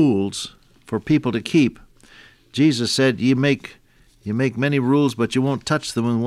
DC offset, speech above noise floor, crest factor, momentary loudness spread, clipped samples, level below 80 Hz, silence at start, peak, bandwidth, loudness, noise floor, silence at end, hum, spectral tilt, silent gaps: under 0.1%; 29 dB; 14 dB; 11 LU; under 0.1%; -54 dBFS; 0 s; -6 dBFS; 13.5 kHz; -20 LUFS; -49 dBFS; 0 s; none; -5.5 dB/octave; none